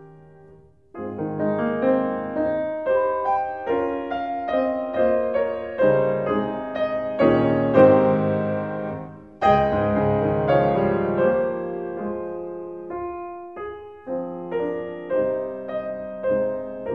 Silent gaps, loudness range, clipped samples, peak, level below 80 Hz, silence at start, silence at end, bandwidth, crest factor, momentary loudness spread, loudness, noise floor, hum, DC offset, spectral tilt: none; 9 LU; under 0.1%; -2 dBFS; -50 dBFS; 0 s; 0 s; 5.4 kHz; 20 dB; 13 LU; -23 LUFS; -51 dBFS; none; 0.1%; -9.5 dB/octave